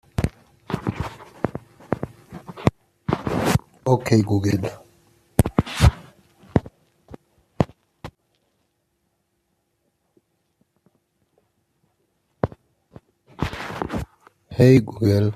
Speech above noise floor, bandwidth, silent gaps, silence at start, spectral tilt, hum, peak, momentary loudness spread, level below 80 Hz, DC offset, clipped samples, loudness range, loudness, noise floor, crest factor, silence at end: 54 dB; 14.5 kHz; none; 0.2 s; -7 dB/octave; none; 0 dBFS; 18 LU; -38 dBFS; under 0.1%; under 0.1%; 14 LU; -23 LUFS; -72 dBFS; 24 dB; 0 s